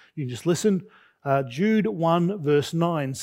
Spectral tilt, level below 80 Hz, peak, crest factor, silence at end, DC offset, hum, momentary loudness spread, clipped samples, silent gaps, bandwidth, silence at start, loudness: -6.5 dB/octave; -68 dBFS; -8 dBFS; 16 dB; 0 s; under 0.1%; none; 7 LU; under 0.1%; none; 16 kHz; 0.15 s; -24 LUFS